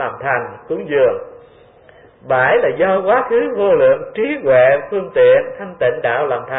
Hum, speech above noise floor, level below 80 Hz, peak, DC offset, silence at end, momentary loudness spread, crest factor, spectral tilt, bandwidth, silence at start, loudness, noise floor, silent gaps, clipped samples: none; 31 dB; -54 dBFS; -2 dBFS; under 0.1%; 0 s; 9 LU; 14 dB; -10.5 dB/octave; 3.9 kHz; 0 s; -15 LUFS; -45 dBFS; none; under 0.1%